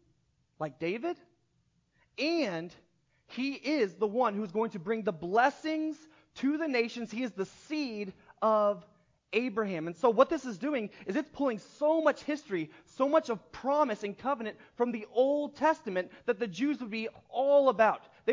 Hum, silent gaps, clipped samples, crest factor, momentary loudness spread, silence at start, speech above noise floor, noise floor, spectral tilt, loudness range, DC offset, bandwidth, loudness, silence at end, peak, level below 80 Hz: none; none; under 0.1%; 22 dB; 11 LU; 0.6 s; 43 dB; -73 dBFS; -5.5 dB/octave; 3 LU; under 0.1%; 7.6 kHz; -31 LUFS; 0 s; -10 dBFS; -74 dBFS